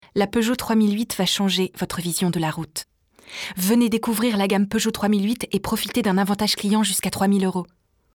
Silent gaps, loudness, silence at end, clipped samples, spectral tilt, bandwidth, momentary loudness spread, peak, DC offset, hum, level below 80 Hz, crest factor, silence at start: none; -21 LUFS; 0.5 s; under 0.1%; -4.5 dB/octave; over 20 kHz; 9 LU; -8 dBFS; under 0.1%; none; -52 dBFS; 14 dB; 0.15 s